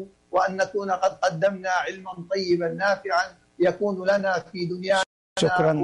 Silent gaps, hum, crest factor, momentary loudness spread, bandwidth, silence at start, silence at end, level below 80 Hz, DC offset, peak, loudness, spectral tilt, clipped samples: 5.06-5.36 s; none; 14 dB; 7 LU; 11.5 kHz; 0 s; 0 s; -64 dBFS; under 0.1%; -10 dBFS; -24 LUFS; -5 dB/octave; under 0.1%